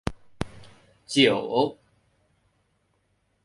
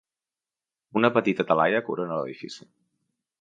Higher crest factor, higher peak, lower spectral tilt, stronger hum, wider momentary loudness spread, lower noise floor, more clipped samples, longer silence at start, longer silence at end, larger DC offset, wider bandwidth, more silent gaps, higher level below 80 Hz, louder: about the same, 22 dB vs 22 dB; about the same, -6 dBFS vs -6 dBFS; second, -4.5 dB/octave vs -6.5 dB/octave; neither; about the same, 17 LU vs 18 LU; second, -70 dBFS vs under -90 dBFS; neither; second, 0.05 s vs 0.95 s; first, 1.7 s vs 0.8 s; neither; first, 11.5 kHz vs 9.2 kHz; neither; first, -50 dBFS vs -72 dBFS; about the same, -25 LUFS vs -25 LUFS